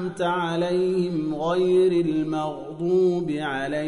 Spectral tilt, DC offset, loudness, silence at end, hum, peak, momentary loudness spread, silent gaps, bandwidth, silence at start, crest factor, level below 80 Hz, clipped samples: -7 dB/octave; under 0.1%; -23 LUFS; 0 s; none; -12 dBFS; 7 LU; none; 11 kHz; 0 s; 12 dB; -58 dBFS; under 0.1%